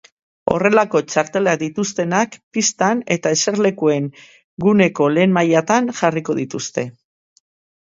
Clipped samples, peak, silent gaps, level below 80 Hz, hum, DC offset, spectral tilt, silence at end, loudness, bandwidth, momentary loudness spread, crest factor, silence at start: under 0.1%; 0 dBFS; 2.43-2.51 s, 4.44-4.57 s; -56 dBFS; none; under 0.1%; -4.5 dB/octave; 0.9 s; -17 LUFS; 7.8 kHz; 9 LU; 18 dB; 0.45 s